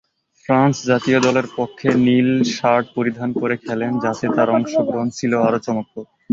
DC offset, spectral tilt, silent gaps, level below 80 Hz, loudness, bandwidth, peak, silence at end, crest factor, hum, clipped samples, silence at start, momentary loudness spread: under 0.1%; -6 dB/octave; none; -58 dBFS; -18 LUFS; 7.6 kHz; -2 dBFS; 0.3 s; 16 dB; none; under 0.1%; 0.5 s; 8 LU